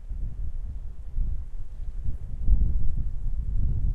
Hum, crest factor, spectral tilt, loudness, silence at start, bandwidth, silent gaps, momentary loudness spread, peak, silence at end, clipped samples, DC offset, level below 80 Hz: none; 16 dB; -10 dB/octave; -33 LUFS; 0 s; 0.9 kHz; none; 13 LU; -6 dBFS; 0 s; under 0.1%; under 0.1%; -26 dBFS